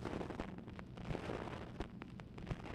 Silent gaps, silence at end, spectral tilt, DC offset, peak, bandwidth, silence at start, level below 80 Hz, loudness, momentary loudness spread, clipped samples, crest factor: none; 0 s; -7 dB/octave; under 0.1%; -26 dBFS; 13 kHz; 0 s; -54 dBFS; -48 LUFS; 7 LU; under 0.1%; 20 dB